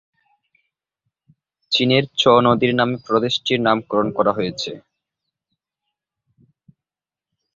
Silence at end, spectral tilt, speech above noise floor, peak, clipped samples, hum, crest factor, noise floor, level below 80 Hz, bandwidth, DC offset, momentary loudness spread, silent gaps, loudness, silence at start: 2.75 s; -5.5 dB/octave; over 72 dB; -2 dBFS; under 0.1%; none; 20 dB; under -90 dBFS; -58 dBFS; 7.6 kHz; under 0.1%; 10 LU; none; -18 LUFS; 1.7 s